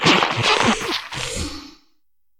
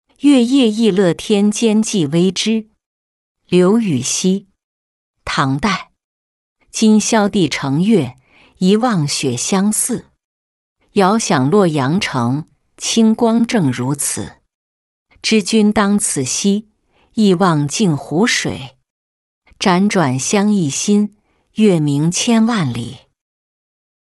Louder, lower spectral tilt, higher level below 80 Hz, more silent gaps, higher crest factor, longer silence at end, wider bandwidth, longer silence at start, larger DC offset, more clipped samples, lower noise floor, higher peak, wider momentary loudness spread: second, -19 LUFS vs -15 LUFS; second, -3 dB/octave vs -4.5 dB/octave; first, -42 dBFS vs -52 dBFS; second, none vs 2.86-3.35 s, 4.64-5.14 s, 6.04-6.56 s, 10.25-10.76 s, 14.54-15.06 s, 18.90-19.42 s; first, 20 dB vs 14 dB; second, 0.7 s vs 1.15 s; first, 17.5 kHz vs 12 kHz; second, 0 s vs 0.25 s; neither; neither; first, -73 dBFS vs -38 dBFS; about the same, -2 dBFS vs -2 dBFS; first, 14 LU vs 9 LU